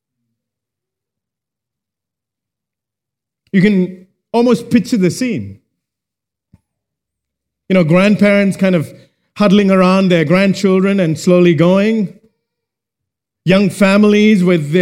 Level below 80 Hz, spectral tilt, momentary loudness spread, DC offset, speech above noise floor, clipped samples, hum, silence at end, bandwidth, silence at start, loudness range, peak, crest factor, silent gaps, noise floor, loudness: -54 dBFS; -7 dB/octave; 9 LU; under 0.1%; 73 dB; under 0.1%; none; 0 s; 13 kHz; 3.55 s; 8 LU; 0 dBFS; 14 dB; none; -84 dBFS; -12 LUFS